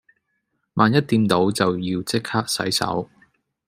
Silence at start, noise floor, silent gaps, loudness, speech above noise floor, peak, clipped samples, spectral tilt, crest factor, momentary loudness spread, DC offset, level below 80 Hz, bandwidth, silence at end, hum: 0.75 s; -73 dBFS; none; -21 LUFS; 53 dB; 0 dBFS; under 0.1%; -5 dB/octave; 22 dB; 9 LU; under 0.1%; -60 dBFS; 16 kHz; 0.65 s; none